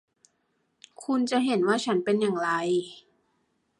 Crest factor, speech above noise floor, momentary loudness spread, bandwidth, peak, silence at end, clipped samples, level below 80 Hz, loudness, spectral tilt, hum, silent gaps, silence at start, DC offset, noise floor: 18 dB; 48 dB; 6 LU; 11.5 kHz; -10 dBFS; 0.8 s; under 0.1%; -78 dBFS; -26 LUFS; -5 dB/octave; none; none; 1 s; under 0.1%; -74 dBFS